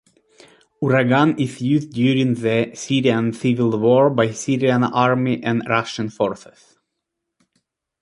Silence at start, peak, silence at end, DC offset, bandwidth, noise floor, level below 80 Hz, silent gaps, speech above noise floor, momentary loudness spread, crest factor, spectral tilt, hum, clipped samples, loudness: 0.8 s; -2 dBFS; 1.65 s; under 0.1%; 11.5 kHz; -79 dBFS; -60 dBFS; none; 61 dB; 7 LU; 18 dB; -6.5 dB/octave; none; under 0.1%; -19 LUFS